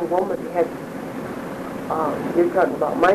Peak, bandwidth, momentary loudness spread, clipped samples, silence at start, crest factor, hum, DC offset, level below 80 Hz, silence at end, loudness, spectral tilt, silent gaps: -6 dBFS; 13.5 kHz; 11 LU; under 0.1%; 0 s; 16 dB; none; under 0.1%; -54 dBFS; 0 s; -23 LUFS; -6.5 dB/octave; none